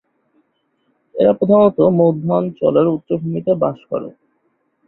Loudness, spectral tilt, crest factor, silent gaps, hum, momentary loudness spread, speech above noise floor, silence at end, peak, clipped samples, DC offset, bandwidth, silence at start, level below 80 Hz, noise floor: -16 LUFS; -12.5 dB/octave; 16 dB; none; none; 13 LU; 50 dB; 0.75 s; -2 dBFS; under 0.1%; under 0.1%; 4.1 kHz; 1.15 s; -56 dBFS; -65 dBFS